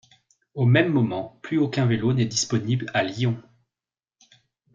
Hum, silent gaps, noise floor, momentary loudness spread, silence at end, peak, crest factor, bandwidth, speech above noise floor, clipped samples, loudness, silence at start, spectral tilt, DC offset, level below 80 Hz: none; none; under -90 dBFS; 9 LU; 1.35 s; -4 dBFS; 20 dB; 7.6 kHz; over 68 dB; under 0.1%; -23 LUFS; 0.55 s; -5.5 dB/octave; under 0.1%; -62 dBFS